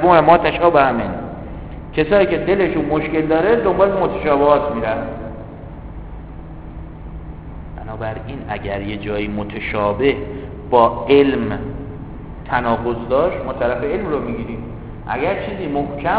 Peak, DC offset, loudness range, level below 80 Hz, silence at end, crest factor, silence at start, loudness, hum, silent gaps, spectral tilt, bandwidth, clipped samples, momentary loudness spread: 0 dBFS; 0.2%; 12 LU; -36 dBFS; 0 s; 18 dB; 0 s; -18 LUFS; none; none; -10.5 dB/octave; 4 kHz; under 0.1%; 21 LU